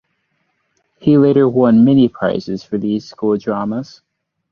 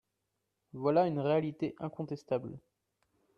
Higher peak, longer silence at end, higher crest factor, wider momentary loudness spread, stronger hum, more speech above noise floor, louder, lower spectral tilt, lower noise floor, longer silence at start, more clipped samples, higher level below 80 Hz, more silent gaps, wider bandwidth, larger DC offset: first, -2 dBFS vs -16 dBFS; about the same, 0.7 s vs 0.8 s; second, 14 dB vs 20 dB; second, 12 LU vs 18 LU; neither; about the same, 53 dB vs 51 dB; first, -15 LUFS vs -33 LUFS; about the same, -9 dB/octave vs -9 dB/octave; second, -66 dBFS vs -84 dBFS; first, 1.05 s vs 0.75 s; neither; first, -54 dBFS vs -74 dBFS; neither; about the same, 6.6 kHz vs 7.2 kHz; neither